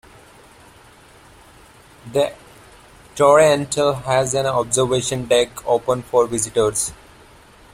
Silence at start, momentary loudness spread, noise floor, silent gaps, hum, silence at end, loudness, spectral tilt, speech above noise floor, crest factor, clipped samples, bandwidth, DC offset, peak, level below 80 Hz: 2.05 s; 9 LU; -47 dBFS; none; none; 0.8 s; -18 LUFS; -3.5 dB/octave; 29 dB; 18 dB; under 0.1%; 16 kHz; under 0.1%; -2 dBFS; -50 dBFS